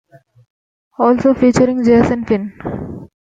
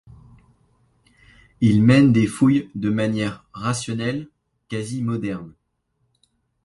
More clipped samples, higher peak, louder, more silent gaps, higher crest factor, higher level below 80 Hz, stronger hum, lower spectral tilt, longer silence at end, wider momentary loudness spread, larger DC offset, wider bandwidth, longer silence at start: neither; about the same, -2 dBFS vs -4 dBFS; first, -14 LUFS vs -20 LUFS; neither; about the same, 14 dB vs 18 dB; first, -42 dBFS vs -52 dBFS; neither; about the same, -7 dB/octave vs -6.5 dB/octave; second, 0.3 s vs 1.15 s; about the same, 15 LU vs 15 LU; neither; second, 9 kHz vs 11.5 kHz; second, 1 s vs 1.6 s